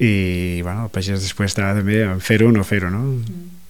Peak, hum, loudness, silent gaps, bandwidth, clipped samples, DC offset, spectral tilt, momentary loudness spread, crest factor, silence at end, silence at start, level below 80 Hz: 0 dBFS; none; -19 LUFS; none; 18 kHz; under 0.1%; 1%; -6 dB/octave; 9 LU; 18 dB; 0.1 s; 0 s; -44 dBFS